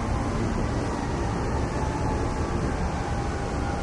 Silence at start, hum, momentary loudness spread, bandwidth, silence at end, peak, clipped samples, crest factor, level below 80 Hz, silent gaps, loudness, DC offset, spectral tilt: 0 s; none; 2 LU; 11.5 kHz; 0 s; -14 dBFS; under 0.1%; 12 dB; -32 dBFS; none; -28 LUFS; under 0.1%; -6.5 dB/octave